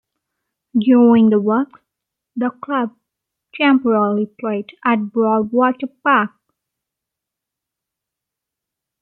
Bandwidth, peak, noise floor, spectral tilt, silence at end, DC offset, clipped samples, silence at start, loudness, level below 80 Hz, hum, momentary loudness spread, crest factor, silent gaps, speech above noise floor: 4.3 kHz; -2 dBFS; -83 dBFS; -10 dB/octave; 2.75 s; under 0.1%; under 0.1%; 0.75 s; -17 LUFS; -68 dBFS; none; 12 LU; 16 dB; none; 68 dB